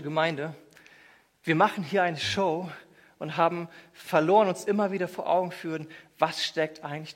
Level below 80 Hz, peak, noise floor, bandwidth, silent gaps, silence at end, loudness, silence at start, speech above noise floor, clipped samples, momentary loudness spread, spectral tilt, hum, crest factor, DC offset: -70 dBFS; -8 dBFS; -58 dBFS; 16 kHz; none; 0.05 s; -27 LUFS; 0 s; 31 dB; under 0.1%; 15 LU; -5 dB/octave; none; 20 dB; under 0.1%